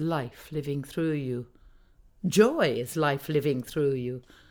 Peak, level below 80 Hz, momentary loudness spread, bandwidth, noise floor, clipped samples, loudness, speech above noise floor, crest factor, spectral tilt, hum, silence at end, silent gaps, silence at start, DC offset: -8 dBFS; -58 dBFS; 13 LU; over 20 kHz; -57 dBFS; under 0.1%; -28 LUFS; 29 dB; 22 dB; -6 dB/octave; none; 0.3 s; none; 0 s; under 0.1%